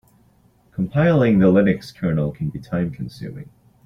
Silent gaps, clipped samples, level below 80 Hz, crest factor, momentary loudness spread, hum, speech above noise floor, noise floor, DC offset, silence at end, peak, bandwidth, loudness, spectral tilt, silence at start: none; under 0.1%; -48 dBFS; 16 dB; 19 LU; none; 38 dB; -56 dBFS; under 0.1%; 0.45 s; -4 dBFS; 6.8 kHz; -19 LUFS; -9 dB/octave; 0.8 s